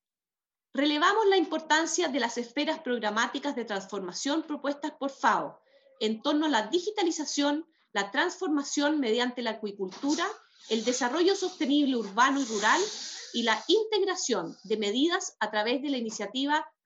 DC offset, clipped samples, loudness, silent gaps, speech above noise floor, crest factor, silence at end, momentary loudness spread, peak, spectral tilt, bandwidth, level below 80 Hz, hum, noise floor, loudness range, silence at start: under 0.1%; under 0.1%; -28 LUFS; none; over 62 dB; 20 dB; 0.15 s; 9 LU; -10 dBFS; -2 dB/octave; 9 kHz; -88 dBFS; none; under -90 dBFS; 4 LU; 0.75 s